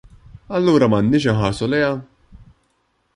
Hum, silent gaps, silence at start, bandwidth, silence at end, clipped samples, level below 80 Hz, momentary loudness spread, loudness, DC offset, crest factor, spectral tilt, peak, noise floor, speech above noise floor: none; none; 0.5 s; 11.5 kHz; 1.1 s; under 0.1%; -44 dBFS; 8 LU; -18 LUFS; under 0.1%; 16 dB; -7 dB/octave; -2 dBFS; -66 dBFS; 49 dB